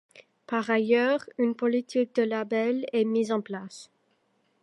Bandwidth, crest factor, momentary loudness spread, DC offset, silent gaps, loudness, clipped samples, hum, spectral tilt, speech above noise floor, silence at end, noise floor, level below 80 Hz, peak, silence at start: 11.5 kHz; 18 dB; 11 LU; under 0.1%; none; -27 LUFS; under 0.1%; none; -5.5 dB/octave; 44 dB; 0.75 s; -71 dBFS; -82 dBFS; -10 dBFS; 0.15 s